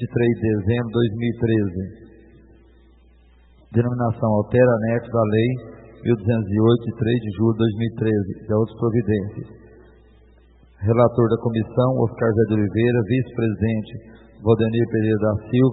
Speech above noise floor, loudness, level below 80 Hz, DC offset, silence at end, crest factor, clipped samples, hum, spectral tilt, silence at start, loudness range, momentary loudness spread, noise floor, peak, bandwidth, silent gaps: 32 dB; -21 LUFS; -48 dBFS; under 0.1%; 0 s; 18 dB; under 0.1%; none; -13 dB/octave; 0 s; 5 LU; 9 LU; -52 dBFS; -2 dBFS; 4.1 kHz; none